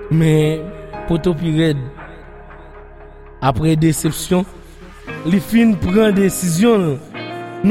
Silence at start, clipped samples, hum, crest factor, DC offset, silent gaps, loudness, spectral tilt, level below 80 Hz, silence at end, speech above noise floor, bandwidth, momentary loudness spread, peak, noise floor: 0 s; under 0.1%; none; 16 dB; under 0.1%; none; -16 LUFS; -6 dB/octave; -38 dBFS; 0 s; 22 dB; 16.5 kHz; 17 LU; -2 dBFS; -37 dBFS